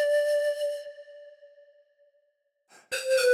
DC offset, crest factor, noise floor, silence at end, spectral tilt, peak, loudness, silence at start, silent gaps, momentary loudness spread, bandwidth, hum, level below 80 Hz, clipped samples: under 0.1%; 16 dB; -74 dBFS; 0 s; 1.5 dB/octave; -14 dBFS; -28 LUFS; 0 s; none; 24 LU; 16 kHz; none; -86 dBFS; under 0.1%